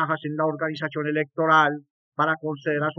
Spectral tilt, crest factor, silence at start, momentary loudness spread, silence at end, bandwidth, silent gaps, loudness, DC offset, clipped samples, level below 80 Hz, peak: -4 dB/octave; 18 dB; 0 s; 9 LU; 0.05 s; 7 kHz; 1.90-2.12 s; -24 LUFS; under 0.1%; under 0.1%; under -90 dBFS; -6 dBFS